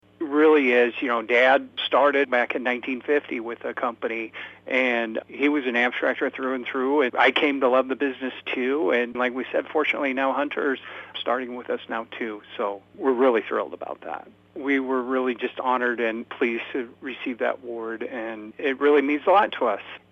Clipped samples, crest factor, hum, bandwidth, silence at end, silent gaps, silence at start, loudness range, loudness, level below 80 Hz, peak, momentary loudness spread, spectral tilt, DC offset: under 0.1%; 18 dB; none; 7 kHz; 0.15 s; none; 0.2 s; 5 LU; -24 LUFS; -74 dBFS; -6 dBFS; 13 LU; -5 dB/octave; under 0.1%